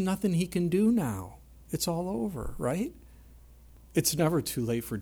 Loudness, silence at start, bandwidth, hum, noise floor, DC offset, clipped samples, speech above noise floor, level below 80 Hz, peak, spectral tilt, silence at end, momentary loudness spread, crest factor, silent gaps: -30 LUFS; 0 s; over 20 kHz; none; -53 dBFS; under 0.1%; under 0.1%; 24 dB; -50 dBFS; -14 dBFS; -5.5 dB/octave; 0 s; 10 LU; 16 dB; none